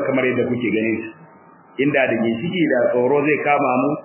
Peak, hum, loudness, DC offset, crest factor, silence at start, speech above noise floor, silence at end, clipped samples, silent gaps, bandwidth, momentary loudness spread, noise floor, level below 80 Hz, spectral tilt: -4 dBFS; none; -19 LUFS; under 0.1%; 16 dB; 0 s; 29 dB; 0 s; under 0.1%; none; 3.2 kHz; 6 LU; -47 dBFS; -62 dBFS; -10 dB/octave